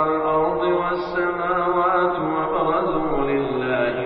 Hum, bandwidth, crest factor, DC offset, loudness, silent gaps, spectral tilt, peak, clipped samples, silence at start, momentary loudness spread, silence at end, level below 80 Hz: none; 5.6 kHz; 14 dB; under 0.1%; -21 LUFS; none; -4.5 dB/octave; -8 dBFS; under 0.1%; 0 s; 3 LU; 0 s; -44 dBFS